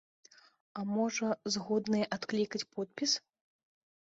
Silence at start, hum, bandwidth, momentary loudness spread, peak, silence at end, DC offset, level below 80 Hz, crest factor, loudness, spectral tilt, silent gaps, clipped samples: 0.75 s; none; 8 kHz; 7 LU; -20 dBFS; 1 s; under 0.1%; -76 dBFS; 16 dB; -34 LUFS; -3.5 dB/octave; none; under 0.1%